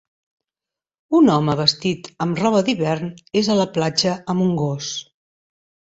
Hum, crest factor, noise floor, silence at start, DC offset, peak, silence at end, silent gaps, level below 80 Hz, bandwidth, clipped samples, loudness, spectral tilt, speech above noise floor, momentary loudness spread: none; 20 dB; -89 dBFS; 1.1 s; under 0.1%; -2 dBFS; 0.9 s; none; -58 dBFS; 8.2 kHz; under 0.1%; -19 LUFS; -5.5 dB/octave; 70 dB; 9 LU